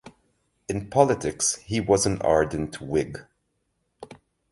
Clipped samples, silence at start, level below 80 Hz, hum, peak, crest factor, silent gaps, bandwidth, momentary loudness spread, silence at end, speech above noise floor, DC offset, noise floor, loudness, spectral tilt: under 0.1%; 0.05 s; -48 dBFS; none; -4 dBFS; 22 dB; none; 11.5 kHz; 12 LU; 0.35 s; 51 dB; under 0.1%; -74 dBFS; -24 LUFS; -4.5 dB/octave